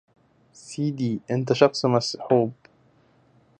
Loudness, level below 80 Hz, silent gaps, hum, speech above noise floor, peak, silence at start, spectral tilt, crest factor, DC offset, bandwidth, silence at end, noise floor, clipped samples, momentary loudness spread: -23 LUFS; -68 dBFS; none; none; 37 dB; -2 dBFS; 0.65 s; -6 dB/octave; 24 dB; under 0.1%; 10 kHz; 1.05 s; -60 dBFS; under 0.1%; 10 LU